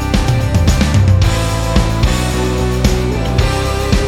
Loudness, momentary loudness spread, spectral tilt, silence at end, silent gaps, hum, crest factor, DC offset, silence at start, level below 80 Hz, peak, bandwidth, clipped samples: -14 LUFS; 4 LU; -5.5 dB/octave; 0 s; none; none; 12 dB; under 0.1%; 0 s; -18 dBFS; 0 dBFS; 16.5 kHz; under 0.1%